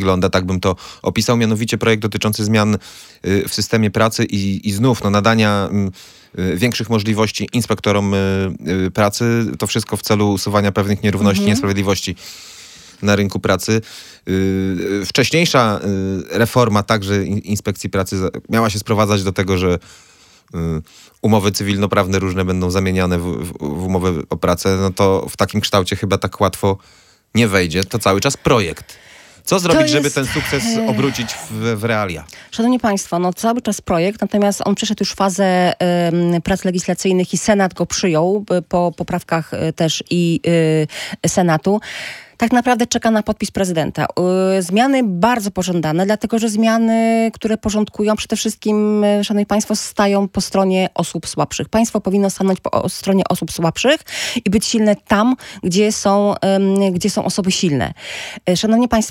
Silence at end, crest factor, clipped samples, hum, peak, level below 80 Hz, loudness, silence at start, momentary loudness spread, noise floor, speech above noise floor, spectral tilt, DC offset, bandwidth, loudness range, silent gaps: 0 s; 16 dB; under 0.1%; none; 0 dBFS; -46 dBFS; -17 LUFS; 0 s; 7 LU; -40 dBFS; 23 dB; -5 dB/octave; under 0.1%; 17 kHz; 2 LU; none